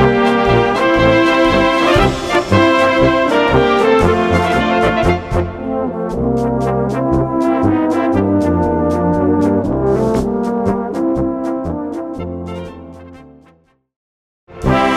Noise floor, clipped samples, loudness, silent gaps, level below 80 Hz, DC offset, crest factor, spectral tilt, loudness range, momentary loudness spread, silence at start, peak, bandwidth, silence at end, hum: -52 dBFS; under 0.1%; -14 LUFS; 13.96-14.47 s; -30 dBFS; under 0.1%; 14 dB; -6.5 dB/octave; 10 LU; 10 LU; 0 s; 0 dBFS; 13.5 kHz; 0 s; none